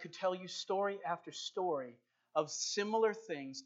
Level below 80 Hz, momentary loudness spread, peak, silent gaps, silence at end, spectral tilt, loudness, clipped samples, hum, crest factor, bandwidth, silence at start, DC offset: under -90 dBFS; 9 LU; -20 dBFS; none; 0 s; -3 dB/octave; -38 LUFS; under 0.1%; none; 20 dB; 8 kHz; 0 s; under 0.1%